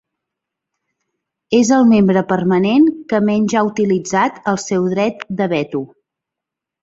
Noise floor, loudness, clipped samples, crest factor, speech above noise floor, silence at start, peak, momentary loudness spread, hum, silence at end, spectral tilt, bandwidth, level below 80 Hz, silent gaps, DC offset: -84 dBFS; -15 LUFS; under 0.1%; 14 dB; 69 dB; 1.5 s; -2 dBFS; 9 LU; none; 0.95 s; -6 dB/octave; 7.8 kHz; -56 dBFS; none; under 0.1%